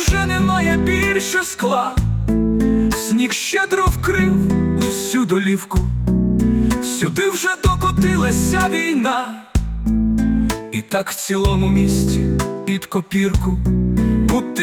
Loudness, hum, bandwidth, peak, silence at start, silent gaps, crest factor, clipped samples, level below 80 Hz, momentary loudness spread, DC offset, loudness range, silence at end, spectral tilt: -18 LUFS; none; 19 kHz; -6 dBFS; 0 s; none; 12 dB; under 0.1%; -26 dBFS; 5 LU; under 0.1%; 1 LU; 0 s; -5.5 dB/octave